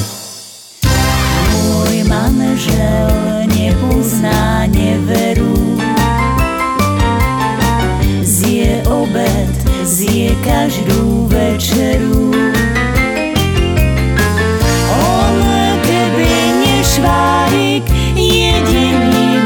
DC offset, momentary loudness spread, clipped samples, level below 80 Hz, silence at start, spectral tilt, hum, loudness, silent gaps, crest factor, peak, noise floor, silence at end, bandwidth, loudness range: under 0.1%; 3 LU; under 0.1%; -20 dBFS; 0 s; -5 dB/octave; none; -12 LUFS; none; 12 dB; 0 dBFS; -33 dBFS; 0 s; 19 kHz; 2 LU